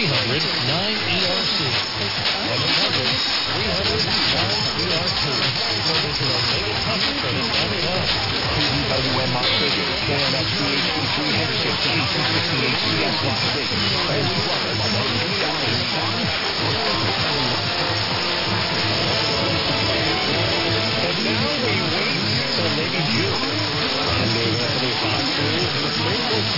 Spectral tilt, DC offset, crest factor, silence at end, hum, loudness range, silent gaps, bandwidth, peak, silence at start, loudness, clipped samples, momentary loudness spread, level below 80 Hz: -4 dB/octave; under 0.1%; 14 dB; 0 s; none; 1 LU; none; 5.8 kHz; -8 dBFS; 0 s; -19 LUFS; under 0.1%; 2 LU; -44 dBFS